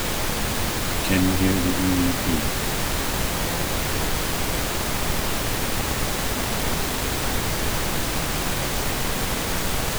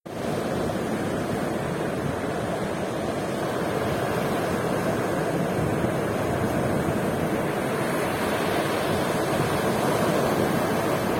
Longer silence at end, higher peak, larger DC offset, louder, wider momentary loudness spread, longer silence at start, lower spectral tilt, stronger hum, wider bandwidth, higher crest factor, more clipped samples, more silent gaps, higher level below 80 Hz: about the same, 0 s vs 0 s; first, -6 dBFS vs -12 dBFS; neither; first, -23 LUFS vs -26 LUFS; about the same, 4 LU vs 4 LU; about the same, 0 s vs 0.05 s; second, -3.5 dB/octave vs -5.5 dB/octave; neither; first, over 20 kHz vs 16.5 kHz; about the same, 18 dB vs 14 dB; neither; neither; first, -30 dBFS vs -48 dBFS